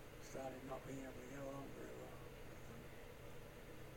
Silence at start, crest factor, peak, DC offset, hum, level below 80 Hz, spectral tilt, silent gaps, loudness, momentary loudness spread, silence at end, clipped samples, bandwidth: 0 s; 16 dB; -36 dBFS; under 0.1%; none; -62 dBFS; -5.5 dB/octave; none; -54 LUFS; 7 LU; 0 s; under 0.1%; 16.5 kHz